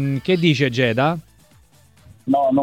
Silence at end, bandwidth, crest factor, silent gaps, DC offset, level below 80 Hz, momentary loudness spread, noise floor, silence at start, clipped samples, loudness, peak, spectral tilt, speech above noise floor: 0 s; 15 kHz; 18 dB; none; under 0.1%; -56 dBFS; 9 LU; -52 dBFS; 0 s; under 0.1%; -19 LUFS; -2 dBFS; -6.5 dB/octave; 35 dB